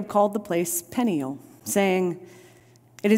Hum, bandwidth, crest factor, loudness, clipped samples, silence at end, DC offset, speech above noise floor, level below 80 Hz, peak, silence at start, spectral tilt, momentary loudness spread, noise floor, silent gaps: none; 16 kHz; 18 dB; -25 LUFS; under 0.1%; 0 s; under 0.1%; 29 dB; -70 dBFS; -8 dBFS; 0 s; -5 dB/octave; 11 LU; -54 dBFS; none